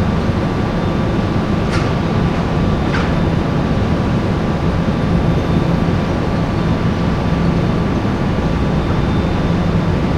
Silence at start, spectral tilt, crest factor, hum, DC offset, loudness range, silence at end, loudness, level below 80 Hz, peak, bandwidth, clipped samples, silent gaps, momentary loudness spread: 0 s; -7.5 dB/octave; 12 dB; none; under 0.1%; 0 LU; 0 s; -16 LUFS; -24 dBFS; -2 dBFS; 10 kHz; under 0.1%; none; 2 LU